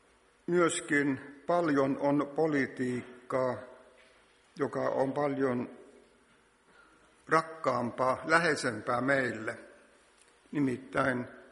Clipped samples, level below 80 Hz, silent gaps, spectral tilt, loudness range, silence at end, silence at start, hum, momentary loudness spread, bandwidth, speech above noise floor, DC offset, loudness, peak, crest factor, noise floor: under 0.1%; -70 dBFS; none; -5.5 dB/octave; 5 LU; 0.1 s; 0.5 s; none; 11 LU; 11.5 kHz; 35 dB; under 0.1%; -31 LUFS; -10 dBFS; 22 dB; -65 dBFS